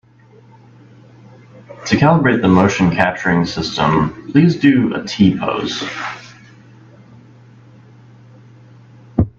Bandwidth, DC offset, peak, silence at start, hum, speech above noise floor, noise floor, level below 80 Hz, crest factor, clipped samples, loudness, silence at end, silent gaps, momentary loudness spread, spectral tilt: 7.6 kHz; under 0.1%; 0 dBFS; 1.7 s; none; 32 dB; -46 dBFS; -44 dBFS; 18 dB; under 0.1%; -15 LUFS; 0.1 s; none; 11 LU; -6.5 dB/octave